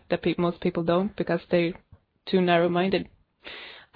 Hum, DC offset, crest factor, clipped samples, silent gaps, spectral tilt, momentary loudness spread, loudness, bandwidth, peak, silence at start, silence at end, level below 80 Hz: none; under 0.1%; 18 dB; under 0.1%; none; -9.5 dB/octave; 20 LU; -25 LUFS; 5 kHz; -8 dBFS; 0.1 s; 0.15 s; -58 dBFS